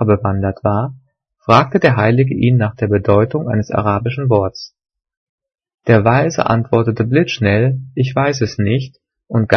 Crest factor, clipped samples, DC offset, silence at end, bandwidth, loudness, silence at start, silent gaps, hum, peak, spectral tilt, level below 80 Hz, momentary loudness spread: 14 dB; under 0.1%; under 0.1%; 0 s; 6.6 kHz; -15 LUFS; 0 s; 5.17-5.38 s, 5.74-5.78 s; none; 0 dBFS; -7.5 dB/octave; -48 dBFS; 8 LU